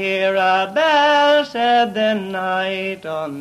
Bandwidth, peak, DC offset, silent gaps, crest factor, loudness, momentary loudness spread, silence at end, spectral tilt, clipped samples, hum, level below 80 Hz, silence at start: 13.5 kHz; -4 dBFS; under 0.1%; none; 12 dB; -17 LUFS; 11 LU; 0 s; -4.5 dB/octave; under 0.1%; 50 Hz at -60 dBFS; -64 dBFS; 0 s